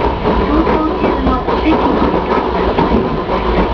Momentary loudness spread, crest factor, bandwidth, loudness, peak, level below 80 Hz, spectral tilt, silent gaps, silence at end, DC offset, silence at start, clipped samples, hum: 2 LU; 14 dB; 5.4 kHz; -14 LUFS; 0 dBFS; -22 dBFS; -8.5 dB/octave; none; 0 s; under 0.1%; 0 s; under 0.1%; none